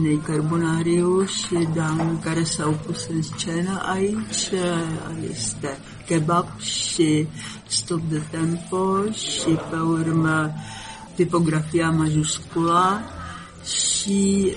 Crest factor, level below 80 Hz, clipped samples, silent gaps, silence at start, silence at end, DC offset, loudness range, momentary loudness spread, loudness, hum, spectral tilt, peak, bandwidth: 16 dB; -50 dBFS; under 0.1%; none; 0 s; 0 s; under 0.1%; 3 LU; 10 LU; -22 LUFS; none; -4.5 dB/octave; -6 dBFS; 11 kHz